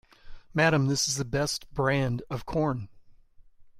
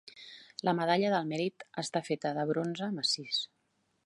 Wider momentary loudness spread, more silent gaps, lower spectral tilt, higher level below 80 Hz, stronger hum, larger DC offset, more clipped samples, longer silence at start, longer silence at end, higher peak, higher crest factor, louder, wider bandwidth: second, 10 LU vs 13 LU; neither; about the same, -4.5 dB/octave vs -4.5 dB/octave; first, -50 dBFS vs -82 dBFS; neither; neither; neither; first, 0.25 s vs 0.05 s; second, 0 s vs 0.6 s; first, -8 dBFS vs -14 dBFS; about the same, 20 dB vs 20 dB; first, -27 LUFS vs -32 LUFS; first, 15.5 kHz vs 11.5 kHz